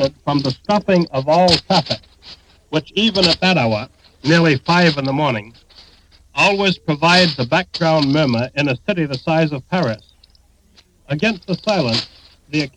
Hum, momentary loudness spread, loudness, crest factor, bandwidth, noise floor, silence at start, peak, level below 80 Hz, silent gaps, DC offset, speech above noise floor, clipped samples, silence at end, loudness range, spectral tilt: none; 11 LU; -16 LUFS; 18 dB; 10.5 kHz; -53 dBFS; 0 s; 0 dBFS; -48 dBFS; none; under 0.1%; 37 dB; under 0.1%; 0.05 s; 5 LU; -5.5 dB/octave